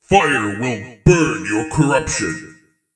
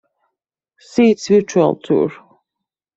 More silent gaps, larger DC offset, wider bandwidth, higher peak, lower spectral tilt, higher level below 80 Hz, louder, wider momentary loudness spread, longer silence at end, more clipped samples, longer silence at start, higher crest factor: neither; neither; first, 10 kHz vs 8 kHz; about the same, 0 dBFS vs -2 dBFS; about the same, -5 dB/octave vs -6 dB/octave; first, -36 dBFS vs -60 dBFS; about the same, -17 LUFS vs -16 LUFS; about the same, 9 LU vs 8 LU; second, 0.45 s vs 0.85 s; neither; second, 0.1 s vs 0.95 s; about the same, 18 dB vs 16 dB